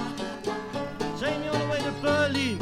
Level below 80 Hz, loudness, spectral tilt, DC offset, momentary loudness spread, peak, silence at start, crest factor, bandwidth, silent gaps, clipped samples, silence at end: -54 dBFS; -28 LUFS; -5 dB/octave; under 0.1%; 9 LU; -12 dBFS; 0 s; 16 dB; 15 kHz; none; under 0.1%; 0 s